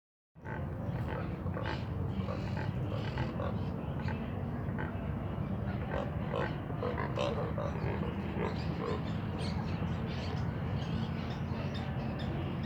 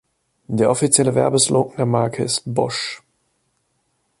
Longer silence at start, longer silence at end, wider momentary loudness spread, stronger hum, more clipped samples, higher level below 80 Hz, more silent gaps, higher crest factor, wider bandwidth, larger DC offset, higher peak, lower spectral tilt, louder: second, 0.35 s vs 0.5 s; second, 0 s vs 1.2 s; second, 2 LU vs 11 LU; neither; neither; first, -48 dBFS vs -58 dBFS; neither; about the same, 16 dB vs 20 dB; second, 9.6 kHz vs 11.5 kHz; neither; second, -20 dBFS vs 0 dBFS; first, -8 dB/octave vs -4 dB/octave; second, -37 LUFS vs -18 LUFS